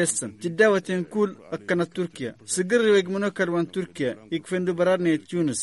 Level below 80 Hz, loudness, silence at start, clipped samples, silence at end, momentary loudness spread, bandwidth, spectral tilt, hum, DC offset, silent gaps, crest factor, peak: -68 dBFS; -24 LUFS; 0 s; under 0.1%; 0 s; 10 LU; 11.5 kHz; -4.5 dB/octave; none; under 0.1%; none; 18 dB; -6 dBFS